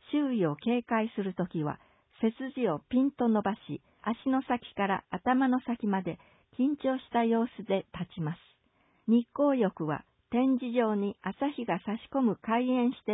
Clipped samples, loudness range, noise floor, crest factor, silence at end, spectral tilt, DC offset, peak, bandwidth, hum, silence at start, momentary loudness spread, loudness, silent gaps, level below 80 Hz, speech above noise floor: under 0.1%; 2 LU; -69 dBFS; 16 dB; 0 s; -10.5 dB/octave; under 0.1%; -14 dBFS; 4 kHz; none; 0.1 s; 10 LU; -30 LUFS; none; -68 dBFS; 40 dB